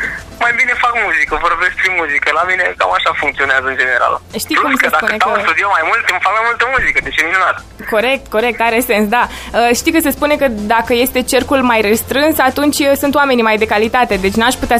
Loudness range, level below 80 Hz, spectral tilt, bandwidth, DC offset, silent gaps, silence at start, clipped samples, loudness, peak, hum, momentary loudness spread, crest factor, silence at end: 1 LU; -36 dBFS; -3 dB/octave; 15.5 kHz; under 0.1%; none; 0 s; under 0.1%; -12 LUFS; 0 dBFS; none; 3 LU; 14 dB; 0 s